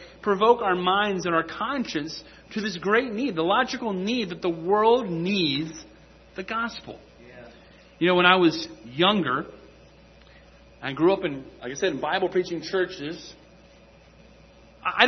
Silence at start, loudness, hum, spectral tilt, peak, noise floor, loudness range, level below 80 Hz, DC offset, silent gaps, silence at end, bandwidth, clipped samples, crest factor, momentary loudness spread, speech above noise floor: 0 s; -24 LUFS; none; -5 dB/octave; -2 dBFS; -52 dBFS; 5 LU; -58 dBFS; under 0.1%; none; 0 s; 6.4 kHz; under 0.1%; 24 dB; 16 LU; 28 dB